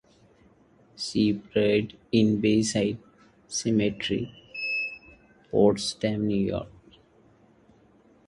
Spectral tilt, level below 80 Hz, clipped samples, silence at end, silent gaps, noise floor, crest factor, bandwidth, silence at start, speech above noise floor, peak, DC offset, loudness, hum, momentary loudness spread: -5 dB/octave; -56 dBFS; under 0.1%; 1.6 s; none; -59 dBFS; 20 dB; 11.5 kHz; 1 s; 34 dB; -8 dBFS; under 0.1%; -26 LUFS; none; 12 LU